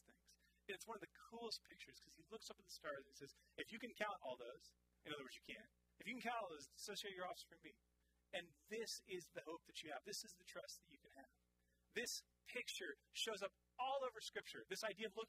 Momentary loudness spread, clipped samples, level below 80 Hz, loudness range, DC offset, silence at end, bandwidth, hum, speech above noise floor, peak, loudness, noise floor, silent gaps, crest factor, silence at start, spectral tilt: 14 LU; under 0.1%; -84 dBFS; 6 LU; under 0.1%; 0 s; 15.5 kHz; none; 31 dB; -30 dBFS; -52 LUFS; -84 dBFS; none; 24 dB; 0.1 s; -1.5 dB/octave